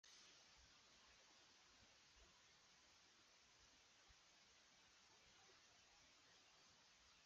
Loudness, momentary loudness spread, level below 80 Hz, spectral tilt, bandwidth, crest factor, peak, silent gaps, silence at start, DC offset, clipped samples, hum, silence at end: -69 LUFS; 4 LU; -86 dBFS; 0 dB/octave; 7.6 kHz; 16 dB; -56 dBFS; none; 0.05 s; under 0.1%; under 0.1%; none; 0 s